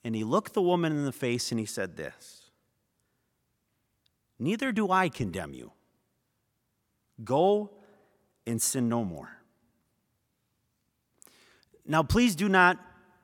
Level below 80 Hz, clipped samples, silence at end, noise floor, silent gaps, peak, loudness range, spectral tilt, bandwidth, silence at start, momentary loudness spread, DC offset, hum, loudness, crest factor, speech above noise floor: -54 dBFS; under 0.1%; 0.4 s; -78 dBFS; none; -6 dBFS; 8 LU; -4.5 dB/octave; 18 kHz; 0.05 s; 18 LU; under 0.1%; none; -28 LUFS; 24 dB; 50 dB